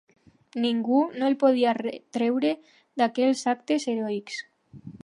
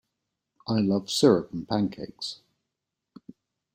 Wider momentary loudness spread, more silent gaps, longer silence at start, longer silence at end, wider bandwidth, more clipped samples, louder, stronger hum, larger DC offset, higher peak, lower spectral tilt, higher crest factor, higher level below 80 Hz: about the same, 15 LU vs 15 LU; neither; about the same, 0.55 s vs 0.65 s; second, 0.1 s vs 1.4 s; second, 11 kHz vs 16 kHz; neither; about the same, -25 LUFS vs -26 LUFS; neither; neither; about the same, -8 dBFS vs -6 dBFS; about the same, -4.5 dB/octave vs -5.5 dB/octave; about the same, 18 dB vs 22 dB; second, -74 dBFS vs -64 dBFS